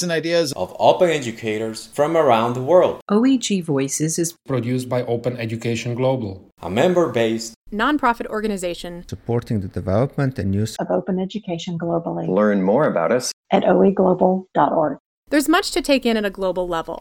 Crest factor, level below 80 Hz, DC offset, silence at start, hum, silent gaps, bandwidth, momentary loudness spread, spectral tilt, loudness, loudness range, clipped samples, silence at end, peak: 20 dB; -50 dBFS; under 0.1%; 0 s; none; 3.02-3.06 s, 7.56-7.65 s, 13.33-13.43 s, 15.00-15.23 s; 17.5 kHz; 9 LU; -5.5 dB/octave; -20 LUFS; 5 LU; under 0.1%; 0 s; 0 dBFS